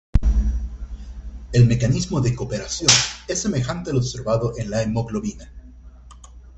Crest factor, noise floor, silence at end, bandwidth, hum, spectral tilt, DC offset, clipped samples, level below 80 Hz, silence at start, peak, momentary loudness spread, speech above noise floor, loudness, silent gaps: 22 dB; -43 dBFS; 0.1 s; 8.4 kHz; none; -4 dB/octave; under 0.1%; under 0.1%; -28 dBFS; 0.15 s; 0 dBFS; 20 LU; 22 dB; -21 LUFS; none